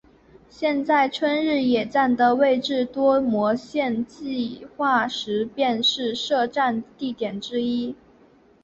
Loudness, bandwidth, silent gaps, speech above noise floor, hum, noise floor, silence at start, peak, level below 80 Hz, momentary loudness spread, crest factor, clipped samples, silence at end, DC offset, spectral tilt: -22 LUFS; 8 kHz; none; 32 dB; none; -55 dBFS; 0.6 s; -6 dBFS; -62 dBFS; 9 LU; 16 dB; under 0.1%; 0.7 s; under 0.1%; -4.5 dB/octave